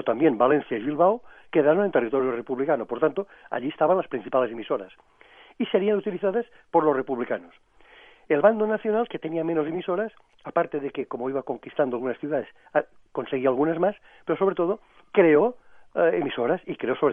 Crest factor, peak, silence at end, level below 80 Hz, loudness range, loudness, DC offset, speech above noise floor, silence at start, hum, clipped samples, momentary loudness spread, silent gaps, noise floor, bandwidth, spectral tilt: 20 dB; -4 dBFS; 0 s; -68 dBFS; 4 LU; -25 LUFS; under 0.1%; 28 dB; 0 s; none; under 0.1%; 11 LU; none; -52 dBFS; 3.7 kHz; -9.5 dB/octave